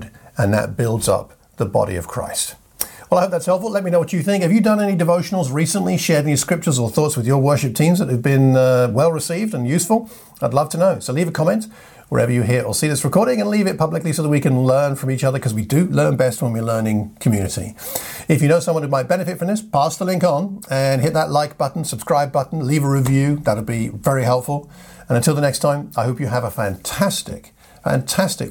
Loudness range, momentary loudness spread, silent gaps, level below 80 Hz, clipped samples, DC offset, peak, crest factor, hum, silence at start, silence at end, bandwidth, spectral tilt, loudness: 4 LU; 7 LU; none; -50 dBFS; under 0.1%; under 0.1%; 0 dBFS; 18 dB; none; 0 s; 0 s; 17.5 kHz; -5.5 dB/octave; -18 LUFS